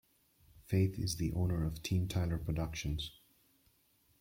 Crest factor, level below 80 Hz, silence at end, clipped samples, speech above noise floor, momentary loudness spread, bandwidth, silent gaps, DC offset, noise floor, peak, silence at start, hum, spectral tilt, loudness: 18 dB; -50 dBFS; 1.1 s; under 0.1%; 37 dB; 6 LU; 16.5 kHz; none; under 0.1%; -72 dBFS; -20 dBFS; 0.55 s; none; -6 dB/octave; -36 LUFS